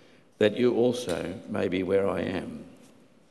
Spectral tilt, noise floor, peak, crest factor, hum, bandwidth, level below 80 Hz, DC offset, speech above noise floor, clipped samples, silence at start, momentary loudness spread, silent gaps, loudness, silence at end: -6 dB/octave; -56 dBFS; -8 dBFS; 20 dB; none; 12.5 kHz; -56 dBFS; under 0.1%; 30 dB; under 0.1%; 0.4 s; 11 LU; none; -27 LUFS; 0.6 s